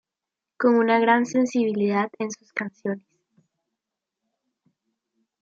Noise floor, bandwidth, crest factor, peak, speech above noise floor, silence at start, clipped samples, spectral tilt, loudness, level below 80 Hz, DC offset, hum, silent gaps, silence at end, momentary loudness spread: -87 dBFS; 7.8 kHz; 20 dB; -6 dBFS; 65 dB; 0.6 s; under 0.1%; -5.5 dB/octave; -23 LUFS; -78 dBFS; under 0.1%; none; none; 2.4 s; 13 LU